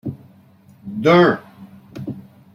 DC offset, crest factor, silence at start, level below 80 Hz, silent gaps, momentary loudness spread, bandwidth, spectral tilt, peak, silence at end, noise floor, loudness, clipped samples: under 0.1%; 18 dB; 0.05 s; -58 dBFS; none; 25 LU; 7.2 kHz; -7.5 dB/octave; -2 dBFS; 0.35 s; -49 dBFS; -15 LUFS; under 0.1%